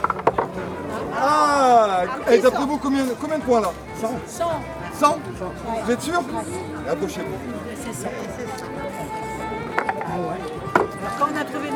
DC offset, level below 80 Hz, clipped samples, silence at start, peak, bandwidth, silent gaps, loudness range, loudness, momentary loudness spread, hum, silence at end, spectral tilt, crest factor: under 0.1%; -48 dBFS; under 0.1%; 0 s; 0 dBFS; 19 kHz; none; 9 LU; -23 LUFS; 13 LU; none; 0 s; -5 dB/octave; 22 dB